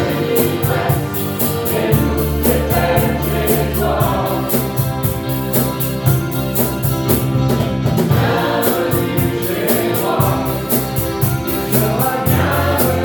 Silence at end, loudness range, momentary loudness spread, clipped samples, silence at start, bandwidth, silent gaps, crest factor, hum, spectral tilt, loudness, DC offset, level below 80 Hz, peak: 0 s; 1 LU; 3 LU; under 0.1%; 0 s; 19 kHz; none; 16 dB; none; -5.5 dB/octave; -16 LUFS; under 0.1%; -32 dBFS; 0 dBFS